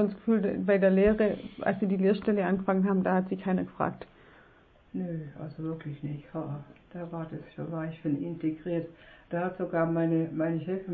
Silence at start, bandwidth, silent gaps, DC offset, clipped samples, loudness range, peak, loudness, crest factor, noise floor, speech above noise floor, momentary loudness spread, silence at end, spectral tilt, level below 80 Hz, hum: 0 s; 4.6 kHz; none; under 0.1%; under 0.1%; 12 LU; -12 dBFS; -30 LUFS; 18 dB; -59 dBFS; 30 dB; 15 LU; 0 s; -11.5 dB/octave; -56 dBFS; none